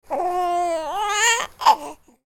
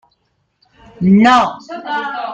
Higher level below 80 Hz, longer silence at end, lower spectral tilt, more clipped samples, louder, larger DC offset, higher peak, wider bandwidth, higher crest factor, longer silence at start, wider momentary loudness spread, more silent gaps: about the same, -54 dBFS vs -52 dBFS; first, 0.35 s vs 0 s; second, 0 dB/octave vs -6.5 dB/octave; neither; second, -20 LUFS vs -13 LUFS; neither; about the same, -2 dBFS vs 0 dBFS; first, 18 kHz vs 8.6 kHz; about the same, 20 dB vs 16 dB; second, 0.1 s vs 1 s; second, 7 LU vs 13 LU; neither